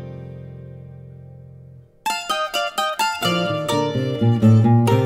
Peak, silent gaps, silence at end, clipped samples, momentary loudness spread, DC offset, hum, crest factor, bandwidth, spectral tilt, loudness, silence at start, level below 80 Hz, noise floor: -4 dBFS; none; 0 s; under 0.1%; 24 LU; under 0.1%; none; 16 dB; 16 kHz; -6 dB/octave; -19 LUFS; 0 s; -54 dBFS; -44 dBFS